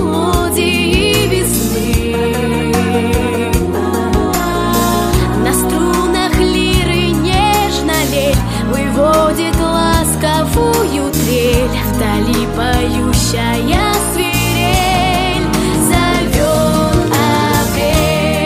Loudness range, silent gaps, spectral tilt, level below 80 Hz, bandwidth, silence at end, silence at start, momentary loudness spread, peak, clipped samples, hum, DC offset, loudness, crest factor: 1 LU; none; -4.5 dB/octave; -22 dBFS; 15.5 kHz; 0 s; 0 s; 3 LU; 0 dBFS; under 0.1%; none; under 0.1%; -13 LUFS; 12 dB